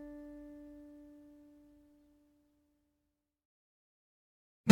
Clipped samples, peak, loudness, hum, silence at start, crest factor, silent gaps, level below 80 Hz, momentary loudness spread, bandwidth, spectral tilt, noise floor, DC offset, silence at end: under 0.1%; -6 dBFS; -49 LUFS; none; 0 s; 32 dB; 3.45-4.64 s; -72 dBFS; 16 LU; 17 kHz; -5.5 dB/octave; -85 dBFS; under 0.1%; 0 s